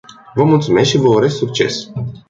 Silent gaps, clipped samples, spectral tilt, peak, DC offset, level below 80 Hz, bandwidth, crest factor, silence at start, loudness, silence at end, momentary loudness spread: none; under 0.1%; -6 dB/octave; -2 dBFS; under 0.1%; -48 dBFS; 7.8 kHz; 14 dB; 0.35 s; -14 LUFS; 0.1 s; 11 LU